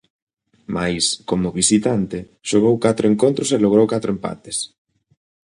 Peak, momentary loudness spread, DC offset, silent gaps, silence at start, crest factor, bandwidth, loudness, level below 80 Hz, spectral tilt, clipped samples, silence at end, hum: -2 dBFS; 11 LU; under 0.1%; none; 0.7 s; 18 dB; 11 kHz; -18 LUFS; -50 dBFS; -4.5 dB/octave; under 0.1%; 0.9 s; none